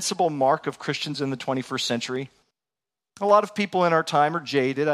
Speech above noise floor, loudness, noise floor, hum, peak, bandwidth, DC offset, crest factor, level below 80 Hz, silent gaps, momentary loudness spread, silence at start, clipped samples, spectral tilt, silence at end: over 67 dB; -24 LUFS; under -90 dBFS; none; -6 dBFS; 14 kHz; under 0.1%; 18 dB; -72 dBFS; none; 9 LU; 0 s; under 0.1%; -4.5 dB/octave; 0 s